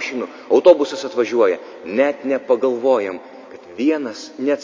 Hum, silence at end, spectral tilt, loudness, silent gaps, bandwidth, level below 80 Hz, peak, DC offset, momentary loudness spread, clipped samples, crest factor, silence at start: none; 0 s; -4.5 dB/octave; -18 LUFS; none; 7.6 kHz; -68 dBFS; 0 dBFS; under 0.1%; 15 LU; under 0.1%; 18 dB; 0 s